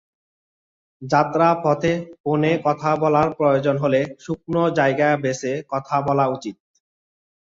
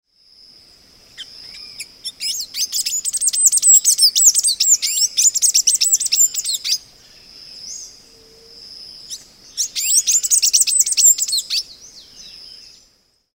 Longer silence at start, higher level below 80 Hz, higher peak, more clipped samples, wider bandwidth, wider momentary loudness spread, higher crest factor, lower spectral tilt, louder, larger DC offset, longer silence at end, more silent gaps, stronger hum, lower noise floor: second, 1 s vs 1.2 s; first, -56 dBFS vs -62 dBFS; about the same, -2 dBFS vs 0 dBFS; neither; second, 7.8 kHz vs 16.5 kHz; second, 8 LU vs 24 LU; about the same, 18 dB vs 18 dB; first, -6.5 dB/octave vs 4.5 dB/octave; second, -20 LUFS vs -13 LUFS; neither; first, 1.05 s vs 0.8 s; first, 2.20-2.24 s vs none; neither; first, under -90 dBFS vs -58 dBFS